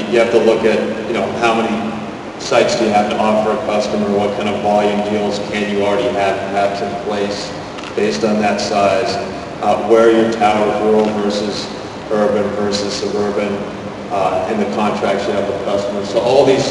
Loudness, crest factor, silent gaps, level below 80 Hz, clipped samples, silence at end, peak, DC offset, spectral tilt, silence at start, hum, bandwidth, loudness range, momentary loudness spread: -16 LUFS; 16 dB; none; -48 dBFS; under 0.1%; 0 s; 0 dBFS; under 0.1%; -5 dB/octave; 0 s; none; 11.5 kHz; 4 LU; 9 LU